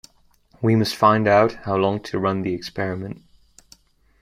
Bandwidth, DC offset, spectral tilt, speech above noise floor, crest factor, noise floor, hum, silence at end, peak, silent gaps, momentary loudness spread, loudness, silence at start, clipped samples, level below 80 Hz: 15.5 kHz; under 0.1%; -6.5 dB/octave; 37 dB; 20 dB; -57 dBFS; none; 1.05 s; -2 dBFS; none; 12 LU; -20 LUFS; 0.6 s; under 0.1%; -54 dBFS